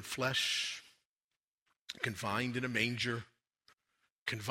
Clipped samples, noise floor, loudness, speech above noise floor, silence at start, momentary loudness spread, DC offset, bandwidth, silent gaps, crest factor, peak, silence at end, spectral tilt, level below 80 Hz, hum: under 0.1%; under -90 dBFS; -35 LUFS; over 54 dB; 0 s; 11 LU; under 0.1%; 16 kHz; 1.06-1.29 s, 1.37-1.66 s, 1.81-1.86 s, 4.10-4.26 s; 24 dB; -16 dBFS; 0 s; -3.5 dB/octave; -72 dBFS; none